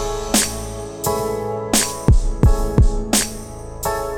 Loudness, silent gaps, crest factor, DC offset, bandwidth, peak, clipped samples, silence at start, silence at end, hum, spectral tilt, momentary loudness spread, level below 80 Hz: -19 LUFS; none; 18 dB; under 0.1%; over 20 kHz; 0 dBFS; under 0.1%; 0 s; 0 s; none; -4 dB/octave; 10 LU; -22 dBFS